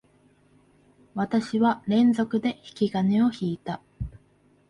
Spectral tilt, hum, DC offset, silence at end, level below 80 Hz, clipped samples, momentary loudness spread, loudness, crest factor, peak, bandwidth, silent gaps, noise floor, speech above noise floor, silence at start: -7.5 dB/octave; none; under 0.1%; 0.6 s; -52 dBFS; under 0.1%; 16 LU; -25 LUFS; 14 dB; -12 dBFS; 11 kHz; none; -61 dBFS; 37 dB; 1.15 s